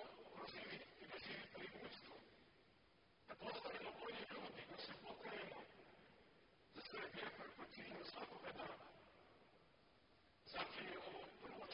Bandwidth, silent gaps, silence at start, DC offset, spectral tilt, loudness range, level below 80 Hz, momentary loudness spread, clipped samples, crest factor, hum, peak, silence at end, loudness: 5.4 kHz; none; 0 s; under 0.1%; -1.5 dB/octave; 3 LU; -82 dBFS; 15 LU; under 0.1%; 20 dB; none; -36 dBFS; 0 s; -54 LUFS